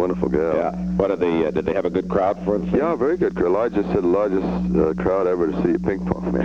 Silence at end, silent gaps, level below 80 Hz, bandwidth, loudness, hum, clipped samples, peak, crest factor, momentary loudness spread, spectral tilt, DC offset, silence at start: 0 s; none; -40 dBFS; 7.4 kHz; -21 LUFS; none; under 0.1%; -4 dBFS; 16 dB; 3 LU; -9 dB/octave; 0.2%; 0 s